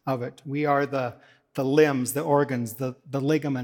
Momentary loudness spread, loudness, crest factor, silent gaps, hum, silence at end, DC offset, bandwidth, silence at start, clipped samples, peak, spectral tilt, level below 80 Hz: 11 LU; -25 LUFS; 20 dB; none; none; 0 s; under 0.1%; 18 kHz; 0.05 s; under 0.1%; -6 dBFS; -6 dB/octave; -74 dBFS